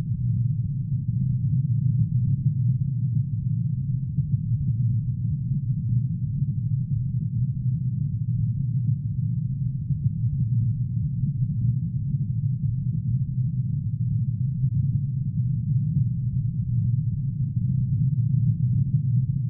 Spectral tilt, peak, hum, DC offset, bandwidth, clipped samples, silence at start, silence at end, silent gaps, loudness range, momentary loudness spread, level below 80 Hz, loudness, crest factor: -20 dB/octave; -12 dBFS; none; under 0.1%; 0.5 kHz; under 0.1%; 0 s; 0 s; none; 2 LU; 4 LU; -42 dBFS; -25 LUFS; 12 dB